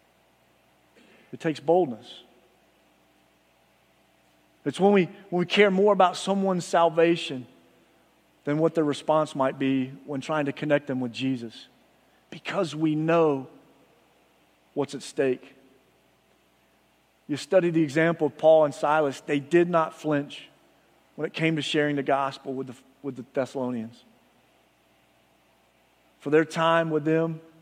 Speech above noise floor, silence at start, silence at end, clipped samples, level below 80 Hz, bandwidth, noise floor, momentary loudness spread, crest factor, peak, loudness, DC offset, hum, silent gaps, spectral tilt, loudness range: 40 dB; 1.3 s; 0.2 s; under 0.1%; -76 dBFS; 13.5 kHz; -64 dBFS; 17 LU; 22 dB; -6 dBFS; -25 LUFS; under 0.1%; none; none; -6 dB/octave; 11 LU